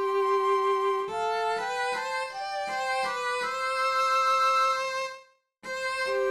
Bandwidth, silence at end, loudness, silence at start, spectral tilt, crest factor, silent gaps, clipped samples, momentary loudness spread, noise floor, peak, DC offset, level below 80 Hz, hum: 14 kHz; 0 s; -27 LUFS; 0 s; -1.5 dB/octave; 12 dB; none; under 0.1%; 10 LU; -53 dBFS; -14 dBFS; under 0.1%; -74 dBFS; none